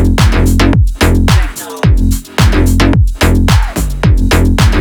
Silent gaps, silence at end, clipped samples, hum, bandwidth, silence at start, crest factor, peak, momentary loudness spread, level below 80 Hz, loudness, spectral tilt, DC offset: none; 0 s; under 0.1%; none; 19.5 kHz; 0 s; 8 dB; 0 dBFS; 4 LU; -12 dBFS; -11 LUFS; -5.5 dB/octave; under 0.1%